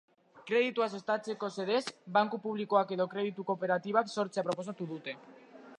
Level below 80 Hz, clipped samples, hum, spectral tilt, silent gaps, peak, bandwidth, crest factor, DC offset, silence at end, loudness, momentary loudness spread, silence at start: -86 dBFS; under 0.1%; none; -5 dB/octave; none; -14 dBFS; 11 kHz; 20 dB; under 0.1%; 0.05 s; -33 LUFS; 10 LU; 0.35 s